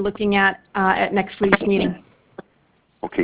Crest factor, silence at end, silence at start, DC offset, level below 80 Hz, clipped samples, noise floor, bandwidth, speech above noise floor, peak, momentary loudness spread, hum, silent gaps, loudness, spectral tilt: 20 dB; 0 s; 0 s; under 0.1%; -48 dBFS; under 0.1%; -61 dBFS; 4 kHz; 42 dB; 0 dBFS; 10 LU; none; none; -19 LUFS; -9.5 dB/octave